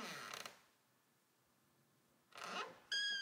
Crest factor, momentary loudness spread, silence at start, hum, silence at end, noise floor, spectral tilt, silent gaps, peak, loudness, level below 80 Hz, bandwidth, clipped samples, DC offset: 18 dB; 14 LU; 0 s; none; 0 s; -78 dBFS; 0 dB/octave; none; -30 dBFS; -45 LUFS; under -90 dBFS; 16 kHz; under 0.1%; under 0.1%